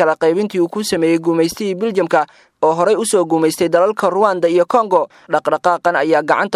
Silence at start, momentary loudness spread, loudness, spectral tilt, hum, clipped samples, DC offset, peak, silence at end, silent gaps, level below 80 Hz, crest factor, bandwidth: 0 s; 4 LU; -15 LUFS; -4.5 dB/octave; none; under 0.1%; under 0.1%; 0 dBFS; 0 s; none; -60 dBFS; 14 dB; 15 kHz